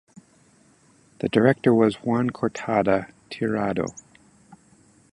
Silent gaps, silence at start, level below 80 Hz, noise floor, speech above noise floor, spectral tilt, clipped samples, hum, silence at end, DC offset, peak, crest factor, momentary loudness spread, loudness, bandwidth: none; 1.25 s; -58 dBFS; -58 dBFS; 36 dB; -7 dB/octave; under 0.1%; none; 0.55 s; under 0.1%; -4 dBFS; 22 dB; 11 LU; -23 LUFS; 11.5 kHz